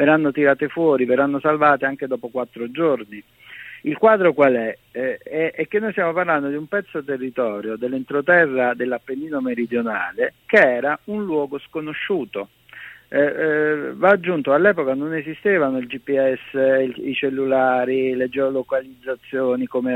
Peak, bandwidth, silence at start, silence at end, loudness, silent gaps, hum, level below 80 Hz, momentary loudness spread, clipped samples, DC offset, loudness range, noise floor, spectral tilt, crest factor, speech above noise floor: 0 dBFS; 15.5 kHz; 0 s; 0 s; -20 LUFS; none; none; -64 dBFS; 11 LU; under 0.1%; under 0.1%; 3 LU; -41 dBFS; -7.5 dB/octave; 20 dB; 22 dB